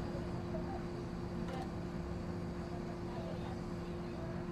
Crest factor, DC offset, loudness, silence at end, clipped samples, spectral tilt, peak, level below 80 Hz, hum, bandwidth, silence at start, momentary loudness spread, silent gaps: 14 dB; under 0.1%; -42 LUFS; 0 s; under 0.1%; -7.5 dB/octave; -28 dBFS; -52 dBFS; none; 12.5 kHz; 0 s; 2 LU; none